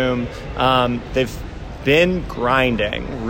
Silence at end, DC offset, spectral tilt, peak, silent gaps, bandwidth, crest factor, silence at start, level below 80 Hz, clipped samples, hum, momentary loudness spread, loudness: 0 s; under 0.1%; -6 dB/octave; -4 dBFS; none; 16.5 kHz; 16 dB; 0 s; -34 dBFS; under 0.1%; none; 10 LU; -19 LUFS